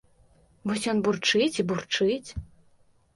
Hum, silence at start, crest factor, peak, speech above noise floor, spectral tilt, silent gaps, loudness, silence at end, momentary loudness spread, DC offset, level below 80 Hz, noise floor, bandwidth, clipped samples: none; 0.65 s; 18 dB; -10 dBFS; 35 dB; -4 dB/octave; none; -26 LUFS; 0.7 s; 14 LU; under 0.1%; -52 dBFS; -61 dBFS; 11.5 kHz; under 0.1%